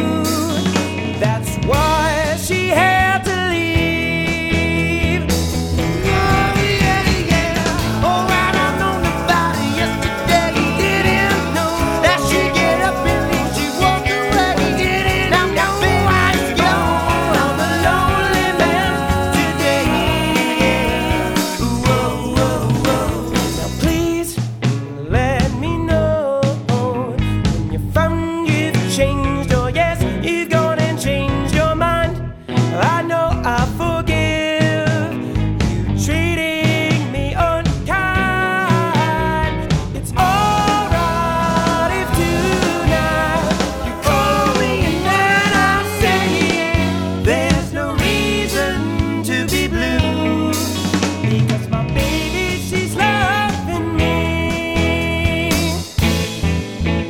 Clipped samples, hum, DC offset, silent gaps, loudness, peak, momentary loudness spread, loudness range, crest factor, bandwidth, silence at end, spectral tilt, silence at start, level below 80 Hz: under 0.1%; none; under 0.1%; none; -16 LUFS; -2 dBFS; 5 LU; 3 LU; 14 dB; 19.5 kHz; 0 s; -5 dB/octave; 0 s; -28 dBFS